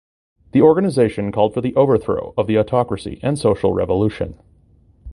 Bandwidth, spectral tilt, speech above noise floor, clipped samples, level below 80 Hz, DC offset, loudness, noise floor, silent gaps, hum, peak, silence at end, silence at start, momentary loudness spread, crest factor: 11.5 kHz; -7.5 dB/octave; 35 dB; under 0.1%; -42 dBFS; under 0.1%; -18 LUFS; -52 dBFS; none; none; 0 dBFS; 0 s; 0.55 s; 9 LU; 18 dB